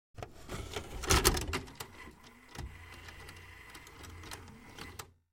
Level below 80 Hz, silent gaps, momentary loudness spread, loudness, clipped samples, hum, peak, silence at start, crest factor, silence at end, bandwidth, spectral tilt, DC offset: -44 dBFS; none; 22 LU; -35 LUFS; under 0.1%; none; -8 dBFS; 0.15 s; 32 dB; 0.2 s; 16.5 kHz; -3 dB/octave; under 0.1%